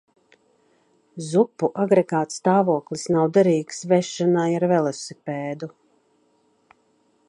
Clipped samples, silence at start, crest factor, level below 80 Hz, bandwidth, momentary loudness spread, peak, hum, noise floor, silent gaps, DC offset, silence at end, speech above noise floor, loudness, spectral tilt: under 0.1%; 1.15 s; 18 dB; -70 dBFS; 11 kHz; 13 LU; -6 dBFS; none; -64 dBFS; none; under 0.1%; 1.6 s; 43 dB; -21 LUFS; -6 dB/octave